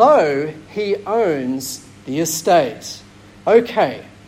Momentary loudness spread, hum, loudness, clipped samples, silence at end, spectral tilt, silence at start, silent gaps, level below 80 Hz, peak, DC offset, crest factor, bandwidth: 15 LU; none; -18 LUFS; under 0.1%; 0.25 s; -4 dB/octave; 0 s; none; -56 dBFS; -2 dBFS; under 0.1%; 16 dB; 16 kHz